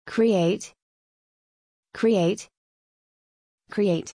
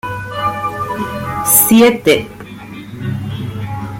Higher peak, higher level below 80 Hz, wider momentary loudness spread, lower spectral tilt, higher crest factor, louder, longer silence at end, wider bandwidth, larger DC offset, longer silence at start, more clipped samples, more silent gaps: second, -10 dBFS vs 0 dBFS; second, -70 dBFS vs -44 dBFS; second, 14 LU vs 22 LU; first, -6 dB/octave vs -4 dB/octave; about the same, 16 dB vs 16 dB; second, -24 LUFS vs -14 LUFS; about the same, 0.05 s vs 0 s; second, 10.5 kHz vs 17 kHz; neither; about the same, 0.05 s vs 0.05 s; neither; first, 0.82-1.83 s, 2.57-3.58 s vs none